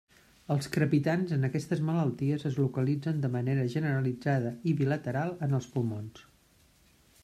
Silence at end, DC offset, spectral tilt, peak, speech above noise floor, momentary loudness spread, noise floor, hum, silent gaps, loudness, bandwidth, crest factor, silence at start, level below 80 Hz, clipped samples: 1 s; under 0.1%; -8 dB/octave; -14 dBFS; 34 dB; 5 LU; -64 dBFS; none; none; -30 LUFS; 13.5 kHz; 16 dB; 0.5 s; -66 dBFS; under 0.1%